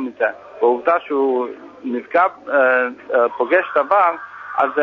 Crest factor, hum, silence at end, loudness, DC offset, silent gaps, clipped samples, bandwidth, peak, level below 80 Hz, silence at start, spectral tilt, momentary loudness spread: 16 dB; none; 0 s; -18 LUFS; under 0.1%; none; under 0.1%; 6 kHz; -2 dBFS; -68 dBFS; 0 s; -6 dB/octave; 11 LU